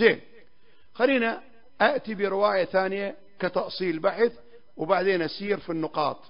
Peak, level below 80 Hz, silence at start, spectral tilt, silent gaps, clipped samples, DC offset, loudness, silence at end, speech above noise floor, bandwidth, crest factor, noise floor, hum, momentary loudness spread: -6 dBFS; -66 dBFS; 0 s; -9.5 dB/octave; none; under 0.1%; 0.4%; -26 LUFS; 0.15 s; 38 dB; 5.4 kHz; 22 dB; -63 dBFS; none; 9 LU